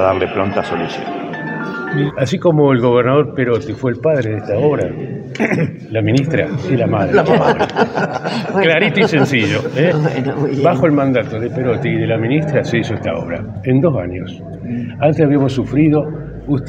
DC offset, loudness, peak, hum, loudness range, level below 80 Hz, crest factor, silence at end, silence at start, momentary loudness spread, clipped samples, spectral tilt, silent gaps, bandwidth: under 0.1%; -16 LUFS; 0 dBFS; none; 3 LU; -46 dBFS; 14 dB; 0 s; 0 s; 10 LU; under 0.1%; -7.5 dB/octave; none; 8.8 kHz